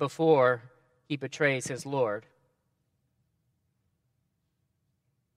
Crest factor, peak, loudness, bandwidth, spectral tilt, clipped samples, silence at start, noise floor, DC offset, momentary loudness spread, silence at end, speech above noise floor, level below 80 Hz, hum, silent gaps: 22 dB; -10 dBFS; -28 LUFS; 13.5 kHz; -5.5 dB/octave; under 0.1%; 0 s; -77 dBFS; under 0.1%; 14 LU; 3.15 s; 50 dB; -78 dBFS; none; none